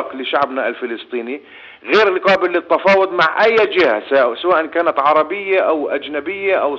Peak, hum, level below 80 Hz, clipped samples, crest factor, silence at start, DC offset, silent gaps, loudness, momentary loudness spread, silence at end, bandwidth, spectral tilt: -2 dBFS; none; -60 dBFS; under 0.1%; 14 dB; 0 s; under 0.1%; none; -15 LUFS; 12 LU; 0 s; 7.4 kHz; -5 dB/octave